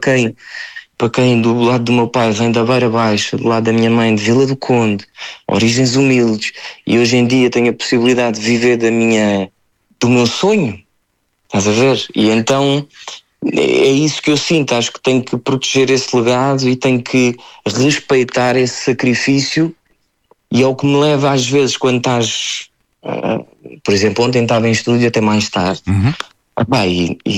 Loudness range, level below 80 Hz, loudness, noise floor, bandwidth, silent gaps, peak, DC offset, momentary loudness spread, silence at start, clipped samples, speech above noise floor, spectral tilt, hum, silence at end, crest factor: 2 LU; -50 dBFS; -14 LUFS; -64 dBFS; 12 kHz; none; -2 dBFS; under 0.1%; 9 LU; 0 s; under 0.1%; 51 dB; -5 dB/octave; none; 0 s; 12 dB